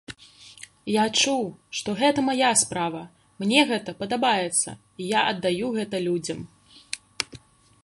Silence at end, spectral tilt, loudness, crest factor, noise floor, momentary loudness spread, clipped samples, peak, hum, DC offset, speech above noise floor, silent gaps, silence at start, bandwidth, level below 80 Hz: 0.5 s; -2.5 dB/octave; -24 LUFS; 24 dB; -49 dBFS; 17 LU; under 0.1%; -2 dBFS; none; under 0.1%; 25 dB; none; 0.1 s; 12 kHz; -64 dBFS